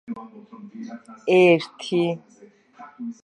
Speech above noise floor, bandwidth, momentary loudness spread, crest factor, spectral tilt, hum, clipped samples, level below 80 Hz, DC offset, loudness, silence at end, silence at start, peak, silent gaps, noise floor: 25 dB; 10 kHz; 25 LU; 18 dB; -6.5 dB/octave; none; under 0.1%; -74 dBFS; under 0.1%; -20 LUFS; 0.1 s; 0.1 s; -6 dBFS; none; -47 dBFS